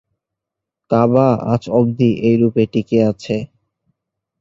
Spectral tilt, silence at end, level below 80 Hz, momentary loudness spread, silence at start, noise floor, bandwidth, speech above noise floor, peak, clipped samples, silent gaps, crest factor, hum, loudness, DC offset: -8.5 dB/octave; 0.95 s; -52 dBFS; 9 LU; 0.9 s; -83 dBFS; 7.6 kHz; 68 dB; -2 dBFS; under 0.1%; none; 16 dB; none; -16 LUFS; under 0.1%